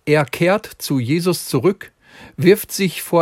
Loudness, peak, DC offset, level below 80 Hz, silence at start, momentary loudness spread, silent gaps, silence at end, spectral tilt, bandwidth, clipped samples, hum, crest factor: -18 LUFS; 0 dBFS; under 0.1%; -56 dBFS; 0.05 s; 7 LU; none; 0 s; -5.5 dB/octave; 16.5 kHz; under 0.1%; none; 16 dB